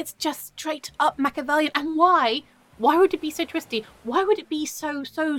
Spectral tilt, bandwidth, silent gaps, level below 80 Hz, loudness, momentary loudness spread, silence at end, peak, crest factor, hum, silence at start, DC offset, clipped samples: -2.5 dB/octave; 17.5 kHz; none; -62 dBFS; -23 LUFS; 11 LU; 0 s; -6 dBFS; 18 dB; none; 0 s; under 0.1%; under 0.1%